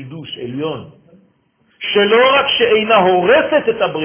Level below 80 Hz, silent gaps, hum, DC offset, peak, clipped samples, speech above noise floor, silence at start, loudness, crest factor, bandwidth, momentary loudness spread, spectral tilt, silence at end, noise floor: -54 dBFS; none; none; under 0.1%; 0 dBFS; under 0.1%; 44 dB; 0 s; -13 LUFS; 14 dB; 3.5 kHz; 15 LU; -8 dB/octave; 0 s; -58 dBFS